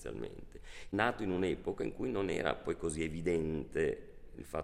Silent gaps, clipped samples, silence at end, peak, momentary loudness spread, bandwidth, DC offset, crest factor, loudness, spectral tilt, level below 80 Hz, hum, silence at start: none; under 0.1%; 0 s; -14 dBFS; 17 LU; 15.5 kHz; under 0.1%; 22 dB; -36 LUFS; -5.5 dB/octave; -54 dBFS; none; 0 s